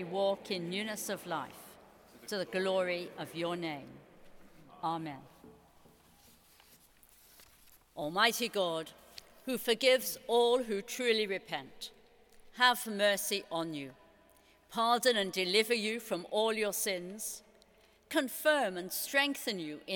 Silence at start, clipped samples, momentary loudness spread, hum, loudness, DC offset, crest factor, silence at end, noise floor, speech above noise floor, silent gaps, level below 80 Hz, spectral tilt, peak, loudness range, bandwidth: 0 s; under 0.1%; 17 LU; none; -33 LUFS; under 0.1%; 24 dB; 0 s; -65 dBFS; 32 dB; none; -72 dBFS; -2.5 dB/octave; -10 dBFS; 12 LU; 19 kHz